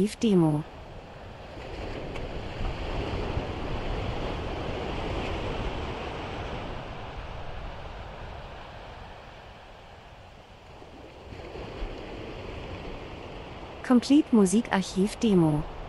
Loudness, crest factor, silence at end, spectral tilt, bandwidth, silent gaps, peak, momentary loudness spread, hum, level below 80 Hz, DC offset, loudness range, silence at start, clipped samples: -29 LUFS; 22 dB; 0 s; -6 dB/octave; 12 kHz; none; -8 dBFS; 23 LU; none; -40 dBFS; under 0.1%; 17 LU; 0 s; under 0.1%